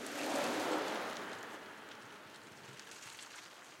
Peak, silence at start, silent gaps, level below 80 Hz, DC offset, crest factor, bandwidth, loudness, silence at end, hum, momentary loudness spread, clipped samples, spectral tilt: -24 dBFS; 0 s; none; under -90 dBFS; under 0.1%; 18 dB; 16.5 kHz; -41 LUFS; 0 s; none; 16 LU; under 0.1%; -2.5 dB/octave